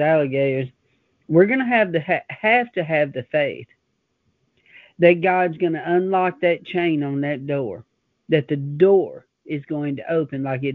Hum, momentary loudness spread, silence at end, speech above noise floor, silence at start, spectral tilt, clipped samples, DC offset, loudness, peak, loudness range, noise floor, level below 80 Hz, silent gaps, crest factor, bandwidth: none; 10 LU; 0 s; 52 dB; 0 s; -10 dB/octave; under 0.1%; under 0.1%; -20 LUFS; 0 dBFS; 2 LU; -71 dBFS; -64 dBFS; none; 20 dB; 4.6 kHz